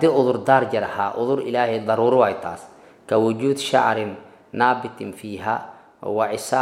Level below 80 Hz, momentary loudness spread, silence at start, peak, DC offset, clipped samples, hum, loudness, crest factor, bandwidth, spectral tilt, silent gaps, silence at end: -68 dBFS; 15 LU; 0 s; -2 dBFS; under 0.1%; under 0.1%; none; -21 LUFS; 20 dB; 15.5 kHz; -5.5 dB/octave; none; 0 s